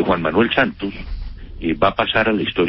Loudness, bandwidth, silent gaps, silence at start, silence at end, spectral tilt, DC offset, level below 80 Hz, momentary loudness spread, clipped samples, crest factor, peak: -18 LUFS; 5.8 kHz; none; 0 s; 0 s; -10.5 dB/octave; under 0.1%; -34 dBFS; 17 LU; under 0.1%; 18 dB; -2 dBFS